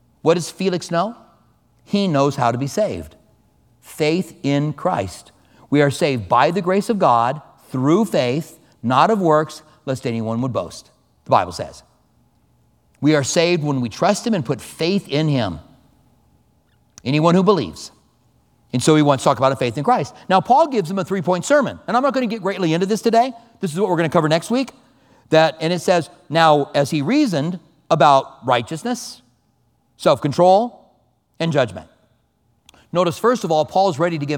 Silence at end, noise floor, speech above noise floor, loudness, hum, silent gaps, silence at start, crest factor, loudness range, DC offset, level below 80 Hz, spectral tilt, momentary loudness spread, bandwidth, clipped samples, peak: 0 s; -63 dBFS; 45 dB; -18 LUFS; none; none; 0.25 s; 18 dB; 5 LU; under 0.1%; -56 dBFS; -5.5 dB/octave; 12 LU; 17.5 kHz; under 0.1%; 0 dBFS